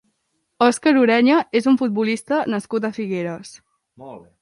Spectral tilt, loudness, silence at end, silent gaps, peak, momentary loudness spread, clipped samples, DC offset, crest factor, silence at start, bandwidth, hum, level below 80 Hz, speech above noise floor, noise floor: -5 dB/octave; -19 LUFS; 0.2 s; none; -4 dBFS; 18 LU; under 0.1%; under 0.1%; 16 dB; 0.6 s; 11.5 kHz; none; -68 dBFS; 53 dB; -71 dBFS